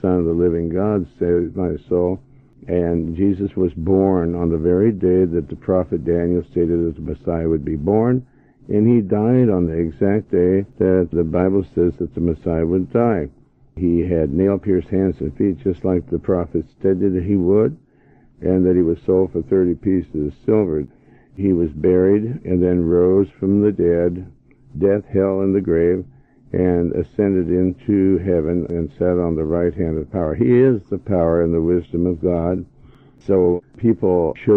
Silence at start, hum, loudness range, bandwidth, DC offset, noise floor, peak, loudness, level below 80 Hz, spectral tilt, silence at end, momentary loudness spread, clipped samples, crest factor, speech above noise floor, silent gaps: 0.05 s; none; 2 LU; 3.9 kHz; under 0.1%; -52 dBFS; -2 dBFS; -18 LUFS; -40 dBFS; -12 dB/octave; 0 s; 7 LU; under 0.1%; 14 dB; 34 dB; none